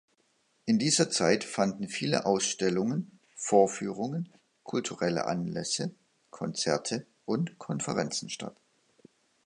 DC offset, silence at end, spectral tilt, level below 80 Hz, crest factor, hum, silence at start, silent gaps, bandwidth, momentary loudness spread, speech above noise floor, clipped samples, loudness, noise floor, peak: under 0.1%; 0.95 s; -4 dB/octave; -70 dBFS; 22 dB; none; 0.65 s; none; 11.5 kHz; 13 LU; 42 dB; under 0.1%; -30 LUFS; -71 dBFS; -10 dBFS